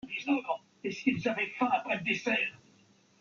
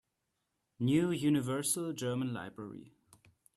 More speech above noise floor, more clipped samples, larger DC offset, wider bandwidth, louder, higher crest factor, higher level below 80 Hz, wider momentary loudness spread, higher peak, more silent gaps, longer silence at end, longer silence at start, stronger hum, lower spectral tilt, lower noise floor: second, 33 dB vs 51 dB; neither; neither; second, 7.2 kHz vs 13.5 kHz; about the same, -31 LUFS vs -33 LUFS; about the same, 18 dB vs 18 dB; about the same, -74 dBFS vs -72 dBFS; second, 7 LU vs 17 LU; first, -14 dBFS vs -18 dBFS; neither; about the same, 0.65 s vs 0.7 s; second, 0.05 s vs 0.8 s; neither; about the same, -5 dB/octave vs -5 dB/octave; second, -64 dBFS vs -84 dBFS